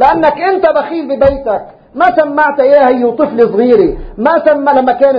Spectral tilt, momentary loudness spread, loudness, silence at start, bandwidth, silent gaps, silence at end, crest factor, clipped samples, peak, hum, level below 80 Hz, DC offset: -8 dB/octave; 8 LU; -10 LUFS; 0 s; 5.2 kHz; none; 0 s; 10 dB; 0.3%; 0 dBFS; none; -36 dBFS; under 0.1%